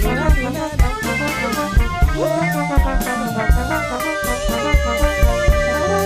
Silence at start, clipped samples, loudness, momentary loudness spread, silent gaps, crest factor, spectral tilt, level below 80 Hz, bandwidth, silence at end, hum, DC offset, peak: 0 s; under 0.1%; -18 LUFS; 4 LU; none; 14 dB; -5.5 dB/octave; -20 dBFS; 15.5 kHz; 0 s; none; under 0.1%; -2 dBFS